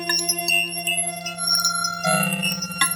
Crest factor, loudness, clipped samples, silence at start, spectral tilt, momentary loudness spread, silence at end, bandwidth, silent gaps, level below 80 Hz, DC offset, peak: 20 dB; -20 LUFS; under 0.1%; 0 s; -1.5 dB/octave; 5 LU; 0 s; 17 kHz; none; -62 dBFS; under 0.1%; -4 dBFS